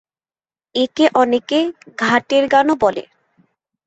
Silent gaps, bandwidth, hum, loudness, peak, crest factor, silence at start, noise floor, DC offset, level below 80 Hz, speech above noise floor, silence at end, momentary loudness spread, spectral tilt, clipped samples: none; 8.2 kHz; none; -16 LUFS; -2 dBFS; 16 dB; 0.75 s; under -90 dBFS; under 0.1%; -58 dBFS; over 74 dB; 0.85 s; 9 LU; -4 dB/octave; under 0.1%